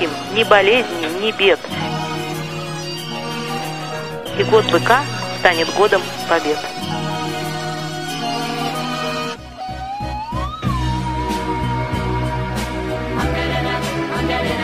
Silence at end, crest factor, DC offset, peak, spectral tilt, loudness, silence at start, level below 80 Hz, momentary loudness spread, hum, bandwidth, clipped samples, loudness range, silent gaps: 0 s; 20 dB; 0.6%; 0 dBFS; -4.5 dB/octave; -19 LUFS; 0 s; -34 dBFS; 11 LU; none; 15.5 kHz; under 0.1%; 6 LU; none